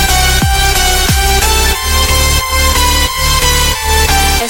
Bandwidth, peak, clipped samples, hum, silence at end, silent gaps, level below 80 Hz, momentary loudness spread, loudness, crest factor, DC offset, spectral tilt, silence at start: 17.5 kHz; 0 dBFS; under 0.1%; none; 0 s; none; -14 dBFS; 2 LU; -10 LUFS; 10 dB; under 0.1%; -2.5 dB/octave; 0 s